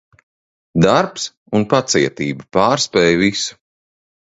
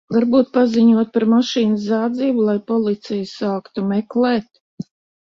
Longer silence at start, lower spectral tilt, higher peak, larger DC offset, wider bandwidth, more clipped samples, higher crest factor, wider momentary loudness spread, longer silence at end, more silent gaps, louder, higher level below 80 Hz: first, 0.75 s vs 0.1 s; second, -4.5 dB/octave vs -6.5 dB/octave; about the same, 0 dBFS vs -2 dBFS; neither; first, 8 kHz vs 7 kHz; neither; about the same, 18 dB vs 14 dB; about the same, 10 LU vs 10 LU; first, 0.85 s vs 0.4 s; second, 1.37-1.46 s vs 4.61-4.78 s; about the same, -16 LUFS vs -18 LUFS; first, -48 dBFS vs -62 dBFS